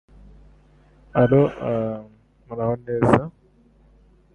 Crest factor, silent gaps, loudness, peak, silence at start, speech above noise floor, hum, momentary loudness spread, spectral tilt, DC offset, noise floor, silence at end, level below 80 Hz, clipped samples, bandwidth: 22 dB; none; -21 LUFS; -2 dBFS; 1.15 s; 35 dB; none; 17 LU; -9 dB/octave; under 0.1%; -55 dBFS; 1.05 s; -48 dBFS; under 0.1%; 10 kHz